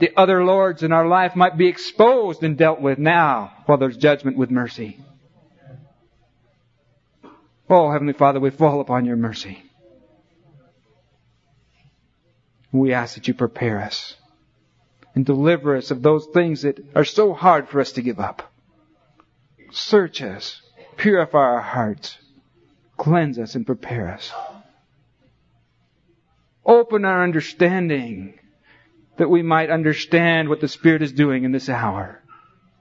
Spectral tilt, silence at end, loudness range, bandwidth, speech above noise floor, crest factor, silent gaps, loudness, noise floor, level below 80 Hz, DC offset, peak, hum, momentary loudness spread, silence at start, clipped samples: -7 dB/octave; 0.7 s; 9 LU; 7.6 kHz; 45 dB; 18 dB; none; -18 LUFS; -63 dBFS; -62 dBFS; under 0.1%; -2 dBFS; none; 15 LU; 0 s; under 0.1%